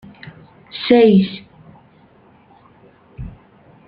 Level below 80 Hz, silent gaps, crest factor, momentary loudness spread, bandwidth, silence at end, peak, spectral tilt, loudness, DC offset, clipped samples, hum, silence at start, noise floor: -48 dBFS; none; 18 dB; 28 LU; 5.2 kHz; 0.6 s; -2 dBFS; -10 dB/octave; -14 LUFS; under 0.1%; under 0.1%; none; 0.75 s; -50 dBFS